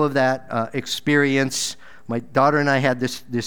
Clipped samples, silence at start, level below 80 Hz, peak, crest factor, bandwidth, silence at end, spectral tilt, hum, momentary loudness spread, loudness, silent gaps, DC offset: under 0.1%; 0 s; -62 dBFS; -4 dBFS; 18 dB; over 20 kHz; 0 s; -4.5 dB/octave; none; 10 LU; -21 LUFS; none; 1%